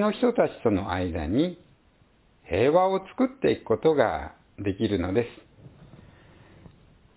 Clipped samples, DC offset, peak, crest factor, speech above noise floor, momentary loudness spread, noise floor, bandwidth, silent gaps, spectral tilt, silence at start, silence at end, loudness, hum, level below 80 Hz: under 0.1%; under 0.1%; -6 dBFS; 20 dB; 36 dB; 10 LU; -61 dBFS; 4 kHz; none; -11 dB/octave; 0 s; 1.3 s; -25 LUFS; none; -46 dBFS